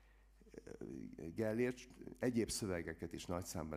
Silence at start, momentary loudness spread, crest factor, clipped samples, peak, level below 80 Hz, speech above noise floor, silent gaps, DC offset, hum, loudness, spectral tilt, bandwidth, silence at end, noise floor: 0 s; 16 LU; 18 dB; under 0.1%; -24 dBFS; -64 dBFS; 24 dB; none; under 0.1%; none; -43 LUFS; -5 dB/octave; 15.5 kHz; 0 s; -66 dBFS